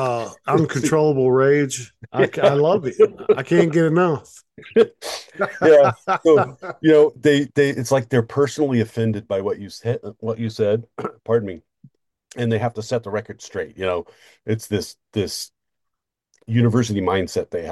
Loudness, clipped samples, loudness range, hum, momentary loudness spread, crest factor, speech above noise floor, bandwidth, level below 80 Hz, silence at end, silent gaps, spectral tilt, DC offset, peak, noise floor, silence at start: -19 LUFS; under 0.1%; 9 LU; none; 13 LU; 18 dB; 62 dB; 12.5 kHz; -58 dBFS; 0 s; none; -6 dB/octave; under 0.1%; -2 dBFS; -81 dBFS; 0 s